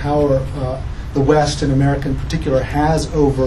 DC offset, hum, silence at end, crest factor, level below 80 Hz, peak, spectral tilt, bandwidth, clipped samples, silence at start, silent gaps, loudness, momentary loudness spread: under 0.1%; none; 0 s; 16 dB; -26 dBFS; 0 dBFS; -6.5 dB/octave; 12 kHz; under 0.1%; 0 s; none; -17 LUFS; 8 LU